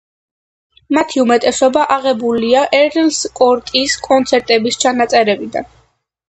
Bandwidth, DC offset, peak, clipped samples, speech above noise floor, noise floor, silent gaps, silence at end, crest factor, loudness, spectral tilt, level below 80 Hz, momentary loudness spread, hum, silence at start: 9 kHz; under 0.1%; 0 dBFS; under 0.1%; 43 dB; -56 dBFS; none; 0.65 s; 14 dB; -13 LUFS; -2.5 dB/octave; -52 dBFS; 4 LU; none; 0.9 s